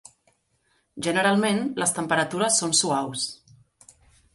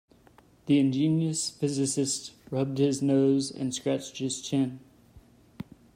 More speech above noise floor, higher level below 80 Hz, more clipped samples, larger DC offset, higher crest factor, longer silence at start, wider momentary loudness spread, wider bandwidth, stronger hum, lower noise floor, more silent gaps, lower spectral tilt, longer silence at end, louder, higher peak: first, 45 dB vs 32 dB; about the same, -66 dBFS vs -66 dBFS; neither; neither; about the same, 20 dB vs 16 dB; first, 0.95 s vs 0.65 s; second, 10 LU vs 14 LU; second, 12 kHz vs 15 kHz; neither; first, -69 dBFS vs -58 dBFS; neither; second, -2.5 dB/octave vs -5.5 dB/octave; first, 1 s vs 0.35 s; first, -23 LUFS vs -27 LUFS; first, -6 dBFS vs -14 dBFS